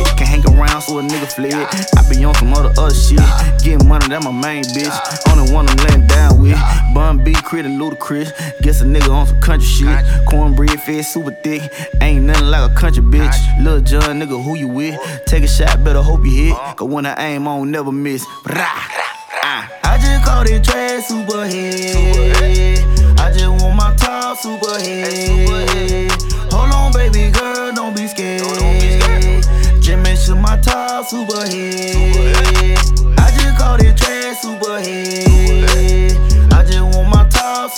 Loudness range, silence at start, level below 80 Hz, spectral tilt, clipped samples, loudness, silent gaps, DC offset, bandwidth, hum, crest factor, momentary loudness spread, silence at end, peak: 4 LU; 0 s; -12 dBFS; -5 dB/octave; under 0.1%; -14 LUFS; none; under 0.1%; 15.5 kHz; none; 10 dB; 9 LU; 0 s; 0 dBFS